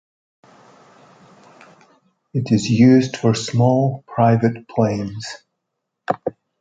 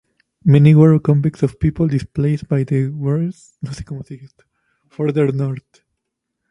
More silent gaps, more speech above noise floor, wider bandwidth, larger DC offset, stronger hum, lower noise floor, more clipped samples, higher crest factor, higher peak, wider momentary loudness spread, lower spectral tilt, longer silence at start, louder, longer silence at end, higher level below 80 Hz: neither; about the same, 61 dB vs 61 dB; about the same, 9 kHz vs 9.6 kHz; neither; neither; about the same, -78 dBFS vs -77 dBFS; neither; about the same, 18 dB vs 16 dB; about the same, -2 dBFS vs 0 dBFS; second, 17 LU vs 20 LU; second, -7 dB/octave vs -9.5 dB/octave; first, 2.35 s vs 0.45 s; about the same, -18 LUFS vs -16 LUFS; second, 0.3 s vs 0.9 s; second, -56 dBFS vs -42 dBFS